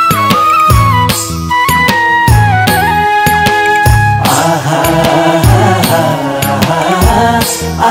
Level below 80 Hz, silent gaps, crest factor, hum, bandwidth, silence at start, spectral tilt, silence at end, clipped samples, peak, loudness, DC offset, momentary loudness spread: -22 dBFS; none; 8 dB; none; 18 kHz; 0 s; -4.5 dB/octave; 0 s; 1%; 0 dBFS; -9 LUFS; under 0.1%; 4 LU